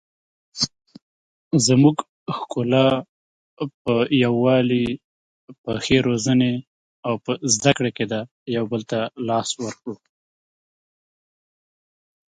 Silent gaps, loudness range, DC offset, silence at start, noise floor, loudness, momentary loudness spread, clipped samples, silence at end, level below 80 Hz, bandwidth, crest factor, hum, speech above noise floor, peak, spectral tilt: 1.02-1.51 s, 2.09-2.26 s, 3.09-3.57 s, 3.74-3.85 s, 5.04-5.48 s, 5.58-5.64 s, 6.67-7.03 s, 8.31-8.46 s; 8 LU; under 0.1%; 0.55 s; under -90 dBFS; -21 LUFS; 14 LU; under 0.1%; 2.4 s; -54 dBFS; 9.6 kHz; 22 dB; none; over 70 dB; 0 dBFS; -5 dB/octave